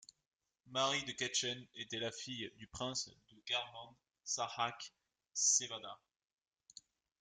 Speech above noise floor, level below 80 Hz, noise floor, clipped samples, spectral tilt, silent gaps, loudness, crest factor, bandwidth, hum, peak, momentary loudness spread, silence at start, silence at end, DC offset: 23 dB; -78 dBFS; -63 dBFS; under 0.1%; -1 dB/octave; none; -38 LUFS; 22 dB; 11 kHz; none; -20 dBFS; 21 LU; 0.65 s; 1.25 s; under 0.1%